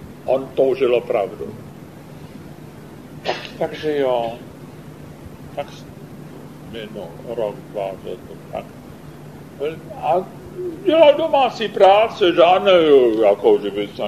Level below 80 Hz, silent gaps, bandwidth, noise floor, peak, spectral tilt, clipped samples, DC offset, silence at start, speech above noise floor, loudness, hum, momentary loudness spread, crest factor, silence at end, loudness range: -54 dBFS; none; 14 kHz; -38 dBFS; 0 dBFS; -6 dB/octave; under 0.1%; 0.2%; 0 s; 21 dB; -17 LUFS; none; 25 LU; 20 dB; 0 s; 16 LU